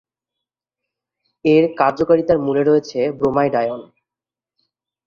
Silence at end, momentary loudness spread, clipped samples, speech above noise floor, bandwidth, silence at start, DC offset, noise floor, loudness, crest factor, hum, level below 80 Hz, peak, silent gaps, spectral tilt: 1.25 s; 7 LU; under 0.1%; 73 dB; 7 kHz; 1.45 s; under 0.1%; -89 dBFS; -17 LUFS; 18 dB; 50 Hz at -50 dBFS; -54 dBFS; -2 dBFS; none; -7.5 dB/octave